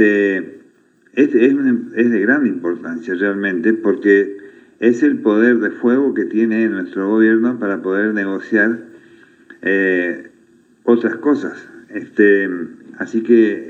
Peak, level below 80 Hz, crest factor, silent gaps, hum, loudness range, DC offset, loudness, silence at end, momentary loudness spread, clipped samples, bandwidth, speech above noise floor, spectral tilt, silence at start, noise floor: 0 dBFS; -76 dBFS; 16 dB; none; none; 4 LU; under 0.1%; -16 LUFS; 0 s; 12 LU; under 0.1%; 7.2 kHz; 37 dB; -7.5 dB/octave; 0 s; -53 dBFS